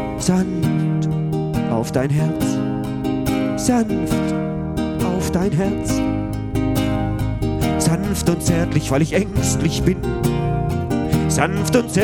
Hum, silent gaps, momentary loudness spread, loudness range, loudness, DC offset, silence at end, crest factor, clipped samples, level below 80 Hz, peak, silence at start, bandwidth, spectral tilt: none; none; 4 LU; 2 LU; -20 LUFS; under 0.1%; 0 s; 18 dB; under 0.1%; -32 dBFS; 0 dBFS; 0 s; 19 kHz; -6 dB/octave